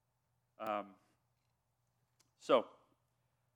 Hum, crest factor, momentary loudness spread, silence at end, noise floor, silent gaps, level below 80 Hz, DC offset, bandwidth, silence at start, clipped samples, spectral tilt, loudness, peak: none; 26 dB; 20 LU; 0.85 s; -82 dBFS; none; under -90 dBFS; under 0.1%; 17.5 kHz; 0.6 s; under 0.1%; -4.5 dB/octave; -37 LUFS; -18 dBFS